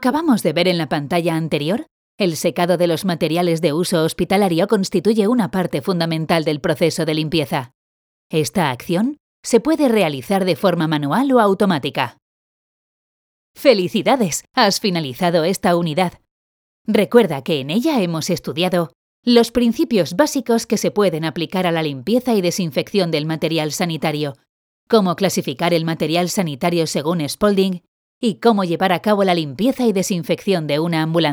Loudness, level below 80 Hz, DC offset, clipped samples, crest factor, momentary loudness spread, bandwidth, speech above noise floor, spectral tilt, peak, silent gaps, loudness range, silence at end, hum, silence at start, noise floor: -18 LUFS; -54 dBFS; under 0.1%; under 0.1%; 18 dB; 6 LU; over 20 kHz; over 73 dB; -5 dB/octave; 0 dBFS; 1.91-2.18 s, 7.74-8.30 s, 9.20-9.43 s, 12.22-13.54 s, 16.31-16.85 s, 18.95-19.23 s, 24.49-24.87 s, 27.88-28.21 s; 2 LU; 0 s; none; 0 s; under -90 dBFS